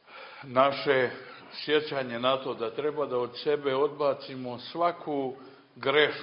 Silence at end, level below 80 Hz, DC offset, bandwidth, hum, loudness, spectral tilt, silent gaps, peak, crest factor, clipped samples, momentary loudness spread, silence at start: 0 s; -74 dBFS; under 0.1%; 5.6 kHz; none; -29 LUFS; -8.5 dB/octave; none; -8 dBFS; 22 dB; under 0.1%; 13 LU; 0.1 s